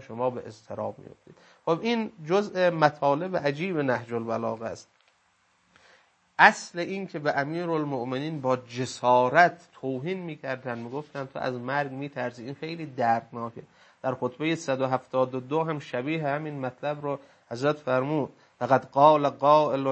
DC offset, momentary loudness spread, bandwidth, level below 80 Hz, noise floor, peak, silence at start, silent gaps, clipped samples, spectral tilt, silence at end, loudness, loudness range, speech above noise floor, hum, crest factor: under 0.1%; 15 LU; 8.8 kHz; -74 dBFS; -67 dBFS; -2 dBFS; 0 s; none; under 0.1%; -6 dB/octave; 0 s; -27 LUFS; 6 LU; 41 dB; none; 26 dB